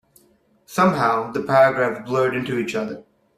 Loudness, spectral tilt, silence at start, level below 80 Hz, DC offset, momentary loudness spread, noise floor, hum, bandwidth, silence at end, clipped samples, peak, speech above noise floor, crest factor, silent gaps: -20 LUFS; -6 dB/octave; 0.7 s; -60 dBFS; under 0.1%; 12 LU; -59 dBFS; none; 15 kHz; 0.35 s; under 0.1%; -2 dBFS; 40 dB; 18 dB; none